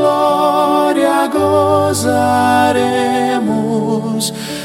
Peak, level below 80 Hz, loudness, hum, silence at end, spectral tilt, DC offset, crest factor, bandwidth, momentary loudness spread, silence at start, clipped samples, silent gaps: -2 dBFS; -54 dBFS; -13 LUFS; none; 0 s; -5 dB/octave; under 0.1%; 12 dB; 16.5 kHz; 5 LU; 0 s; under 0.1%; none